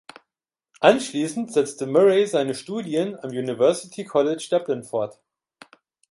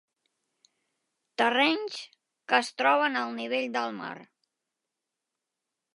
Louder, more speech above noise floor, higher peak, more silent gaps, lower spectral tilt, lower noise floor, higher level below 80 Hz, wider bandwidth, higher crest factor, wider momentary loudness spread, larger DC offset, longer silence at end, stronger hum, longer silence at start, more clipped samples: first, -22 LUFS vs -27 LUFS; first, 67 dB vs 59 dB; first, -2 dBFS vs -8 dBFS; neither; first, -5 dB/octave vs -2.5 dB/octave; about the same, -88 dBFS vs -86 dBFS; first, -70 dBFS vs -88 dBFS; about the same, 11.5 kHz vs 11.5 kHz; about the same, 22 dB vs 24 dB; second, 11 LU vs 17 LU; neither; second, 1 s vs 1.7 s; neither; second, 0.8 s vs 1.4 s; neither